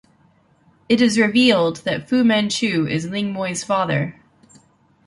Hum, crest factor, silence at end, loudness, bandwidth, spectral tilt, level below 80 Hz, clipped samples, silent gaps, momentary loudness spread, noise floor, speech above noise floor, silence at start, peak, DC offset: none; 18 dB; 0.95 s; -19 LUFS; 11.5 kHz; -4.5 dB/octave; -60 dBFS; under 0.1%; none; 9 LU; -57 dBFS; 39 dB; 0.9 s; -2 dBFS; under 0.1%